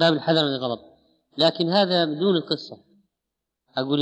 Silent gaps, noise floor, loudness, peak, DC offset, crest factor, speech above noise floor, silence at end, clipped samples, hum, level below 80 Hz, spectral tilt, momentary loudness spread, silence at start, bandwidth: none; -83 dBFS; -22 LUFS; -6 dBFS; under 0.1%; 18 dB; 61 dB; 0 s; under 0.1%; none; -76 dBFS; -6.5 dB/octave; 14 LU; 0 s; 8.8 kHz